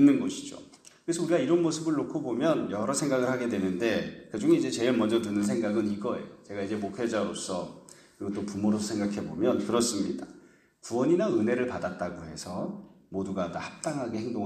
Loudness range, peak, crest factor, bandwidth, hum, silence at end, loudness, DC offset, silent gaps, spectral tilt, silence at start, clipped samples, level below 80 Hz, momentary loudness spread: 5 LU; -10 dBFS; 18 dB; 14 kHz; none; 0 s; -29 LUFS; under 0.1%; none; -5 dB/octave; 0 s; under 0.1%; -64 dBFS; 13 LU